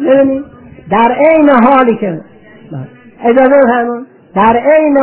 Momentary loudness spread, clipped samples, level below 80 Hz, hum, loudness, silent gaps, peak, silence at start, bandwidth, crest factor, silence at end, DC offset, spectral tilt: 19 LU; 0.4%; -46 dBFS; none; -9 LUFS; none; 0 dBFS; 0 s; 4 kHz; 10 dB; 0 s; under 0.1%; -10 dB/octave